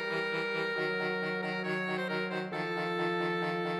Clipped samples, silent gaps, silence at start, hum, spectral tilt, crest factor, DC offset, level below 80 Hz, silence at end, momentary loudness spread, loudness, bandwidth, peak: under 0.1%; none; 0 s; none; -6 dB/octave; 14 dB; under 0.1%; -84 dBFS; 0 s; 2 LU; -33 LUFS; 14.5 kHz; -20 dBFS